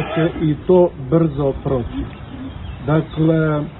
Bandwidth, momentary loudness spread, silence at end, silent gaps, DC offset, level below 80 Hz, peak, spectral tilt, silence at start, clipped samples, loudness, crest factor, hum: 4.1 kHz; 16 LU; 0 s; none; under 0.1%; -36 dBFS; -2 dBFS; -13 dB/octave; 0 s; under 0.1%; -18 LUFS; 16 dB; none